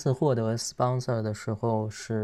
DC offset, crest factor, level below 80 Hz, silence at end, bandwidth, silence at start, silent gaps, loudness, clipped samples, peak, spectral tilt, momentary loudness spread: under 0.1%; 16 dB; -64 dBFS; 0 s; 13 kHz; 0 s; none; -28 LUFS; under 0.1%; -12 dBFS; -6 dB/octave; 5 LU